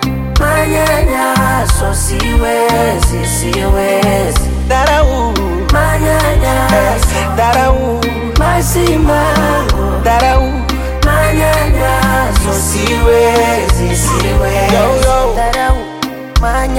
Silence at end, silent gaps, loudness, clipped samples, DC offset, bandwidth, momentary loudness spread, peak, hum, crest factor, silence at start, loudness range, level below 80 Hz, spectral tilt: 0 s; none; -12 LUFS; under 0.1%; under 0.1%; 17 kHz; 4 LU; 0 dBFS; none; 10 dB; 0 s; 1 LU; -16 dBFS; -5 dB/octave